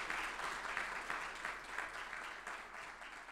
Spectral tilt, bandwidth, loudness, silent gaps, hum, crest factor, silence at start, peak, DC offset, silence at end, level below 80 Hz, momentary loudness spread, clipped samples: -1 dB/octave; 16 kHz; -44 LUFS; none; none; 22 dB; 0 s; -24 dBFS; under 0.1%; 0 s; -66 dBFS; 8 LU; under 0.1%